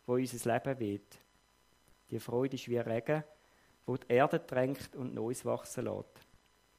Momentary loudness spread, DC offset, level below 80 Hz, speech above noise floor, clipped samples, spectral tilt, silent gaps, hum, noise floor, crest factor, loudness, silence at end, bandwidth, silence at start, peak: 14 LU; under 0.1%; -72 dBFS; 35 dB; under 0.1%; -6 dB/octave; none; none; -69 dBFS; 22 dB; -36 LUFS; 0.6 s; 15.5 kHz; 0.1 s; -14 dBFS